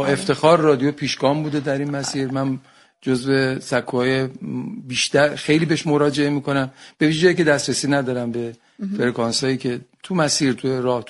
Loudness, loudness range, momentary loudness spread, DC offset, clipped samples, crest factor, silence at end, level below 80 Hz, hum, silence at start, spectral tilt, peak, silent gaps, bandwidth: -20 LUFS; 3 LU; 12 LU; under 0.1%; under 0.1%; 18 dB; 0 s; -58 dBFS; none; 0 s; -5 dB/octave; 0 dBFS; none; 11.5 kHz